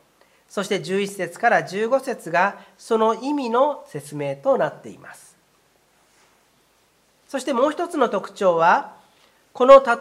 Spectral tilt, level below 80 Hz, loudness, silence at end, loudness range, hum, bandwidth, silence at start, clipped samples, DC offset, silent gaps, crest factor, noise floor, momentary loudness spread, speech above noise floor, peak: -5 dB/octave; -62 dBFS; -20 LUFS; 0 s; 8 LU; none; 13.5 kHz; 0.55 s; under 0.1%; under 0.1%; none; 22 dB; -61 dBFS; 15 LU; 41 dB; 0 dBFS